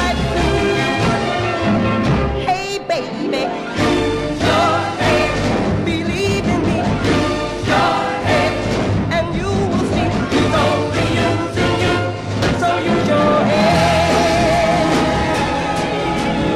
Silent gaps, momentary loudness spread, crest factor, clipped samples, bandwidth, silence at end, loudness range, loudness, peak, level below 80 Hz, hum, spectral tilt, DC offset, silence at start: none; 5 LU; 14 dB; under 0.1%; 14 kHz; 0 s; 3 LU; -16 LUFS; -4 dBFS; -32 dBFS; none; -5.5 dB/octave; under 0.1%; 0 s